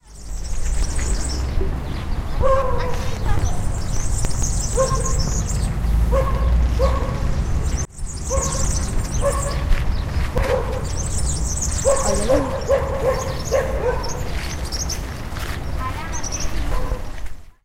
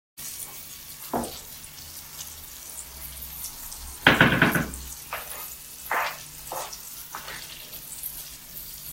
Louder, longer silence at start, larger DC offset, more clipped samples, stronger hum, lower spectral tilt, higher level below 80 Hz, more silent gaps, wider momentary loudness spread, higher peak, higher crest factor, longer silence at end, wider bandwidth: first, -23 LUFS vs -28 LUFS; about the same, 0.1 s vs 0.15 s; neither; neither; neither; about the same, -4.5 dB/octave vs -3.5 dB/octave; first, -22 dBFS vs -48 dBFS; neither; second, 8 LU vs 17 LU; second, -4 dBFS vs 0 dBFS; second, 14 dB vs 30 dB; first, 0.15 s vs 0 s; about the same, 16 kHz vs 16 kHz